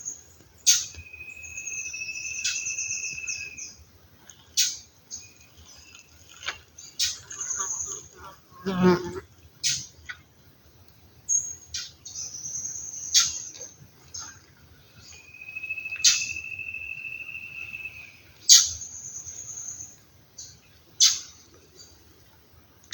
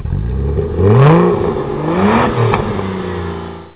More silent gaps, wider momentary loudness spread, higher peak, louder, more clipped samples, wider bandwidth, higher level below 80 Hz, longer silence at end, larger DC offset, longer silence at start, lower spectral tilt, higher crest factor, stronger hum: neither; first, 23 LU vs 13 LU; about the same, 0 dBFS vs 0 dBFS; second, -25 LUFS vs -13 LUFS; neither; first, 19 kHz vs 4 kHz; second, -60 dBFS vs -26 dBFS; first, 1 s vs 0.05 s; second, under 0.1% vs 0.4%; about the same, 0 s vs 0 s; second, -1 dB/octave vs -12 dB/octave; first, 30 dB vs 12 dB; neither